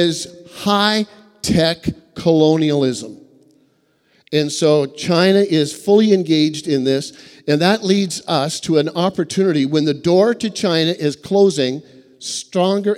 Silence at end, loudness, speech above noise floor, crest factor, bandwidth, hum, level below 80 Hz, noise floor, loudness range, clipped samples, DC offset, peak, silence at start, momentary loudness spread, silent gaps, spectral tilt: 0 s; -17 LUFS; 44 dB; 16 dB; 15.5 kHz; none; -50 dBFS; -60 dBFS; 3 LU; under 0.1%; under 0.1%; -2 dBFS; 0 s; 12 LU; none; -5 dB/octave